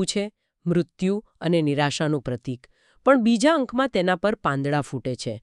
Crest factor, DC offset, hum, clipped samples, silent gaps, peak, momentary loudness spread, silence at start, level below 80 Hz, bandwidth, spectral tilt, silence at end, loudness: 20 dB; under 0.1%; none; under 0.1%; none; -4 dBFS; 12 LU; 0 s; -56 dBFS; 11.5 kHz; -5.5 dB/octave; 0.05 s; -23 LUFS